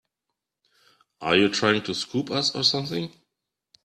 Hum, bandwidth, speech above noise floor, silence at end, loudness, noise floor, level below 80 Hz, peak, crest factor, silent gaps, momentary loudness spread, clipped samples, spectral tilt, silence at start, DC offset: none; 13.5 kHz; 60 dB; 0.75 s; -23 LUFS; -84 dBFS; -66 dBFS; -4 dBFS; 22 dB; none; 11 LU; under 0.1%; -4 dB/octave; 1.2 s; under 0.1%